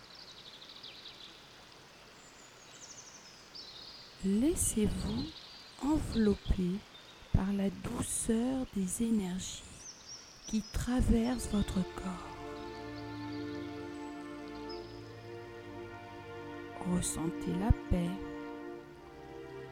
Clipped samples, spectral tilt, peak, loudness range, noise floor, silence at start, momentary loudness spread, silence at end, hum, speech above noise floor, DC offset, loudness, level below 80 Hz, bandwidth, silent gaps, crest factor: under 0.1%; -5 dB/octave; -12 dBFS; 11 LU; -56 dBFS; 0 s; 19 LU; 0 s; none; 23 dB; under 0.1%; -36 LUFS; -44 dBFS; 16.5 kHz; none; 26 dB